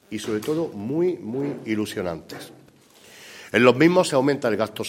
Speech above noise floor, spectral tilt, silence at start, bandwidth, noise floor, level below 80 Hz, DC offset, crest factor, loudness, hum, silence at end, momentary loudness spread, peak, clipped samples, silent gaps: 29 dB; -5.5 dB/octave; 0.1 s; 16.5 kHz; -51 dBFS; -64 dBFS; under 0.1%; 22 dB; -22 LUFS; none; 0 s; 22 LU; -2 dBFS; under 0.1%; none